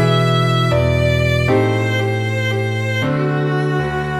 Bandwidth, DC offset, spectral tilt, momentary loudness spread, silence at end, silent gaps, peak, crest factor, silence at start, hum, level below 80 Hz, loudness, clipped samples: 14.5 kHz; 0.4%; -6.5 dB/octave; 4 LU; 0 s; none; -4 dBFS; 12 dB; 0 s; none; -34 dBFS; -17 LUFS; under 0.1%